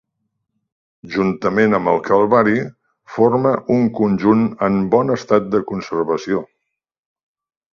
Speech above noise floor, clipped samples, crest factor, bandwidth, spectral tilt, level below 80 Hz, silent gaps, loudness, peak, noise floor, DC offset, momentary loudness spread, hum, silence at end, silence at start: 58 dB; under 0.1%; 18 dB; 7 kHz; -8 dB/octave; -54 dBFS; none; -17 LUFS; 0 dBFS; -74 dBFS; under 0.1%; 8 LU; none; 1.3 s; 1.05 s